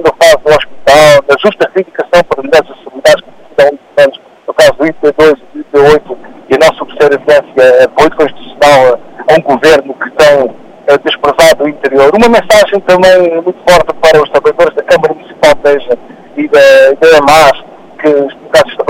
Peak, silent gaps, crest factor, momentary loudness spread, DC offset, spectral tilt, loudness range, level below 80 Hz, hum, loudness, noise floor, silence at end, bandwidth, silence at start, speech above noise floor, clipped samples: 0 dBFS; none; 6 dB; 9 LU; under 0.1%; -4 dB/octave; 2 LU; -36 dBFS; none; -7 LUFS; -24 dBFS; 0 s; 16.5 kHz; 0 s; 20 dB; 2%